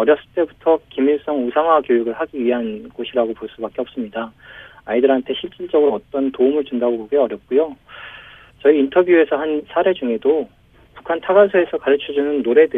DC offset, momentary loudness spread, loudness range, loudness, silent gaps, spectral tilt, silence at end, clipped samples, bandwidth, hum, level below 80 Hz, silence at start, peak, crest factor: under 0.1%; 13 LU; 5 LU; -18 LUFS; none; -8 dB/octave; 0 s; under 0.1%; 3.8 kHz; none; -56 dBFS; 0 s; 0 dBFS; 16 dB